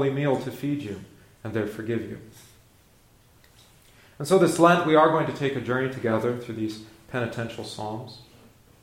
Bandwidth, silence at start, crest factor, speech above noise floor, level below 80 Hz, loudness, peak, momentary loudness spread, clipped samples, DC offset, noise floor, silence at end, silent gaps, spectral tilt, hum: 16.5 kHz; 0 s; 22 dB; 33 dB; -62 dBFS; -25 LUFS; -4 dBFS; 19 LU; under 0.1%; under 0.1%; -57 dBFS; 0.6 s; none; -6 dB/octave; none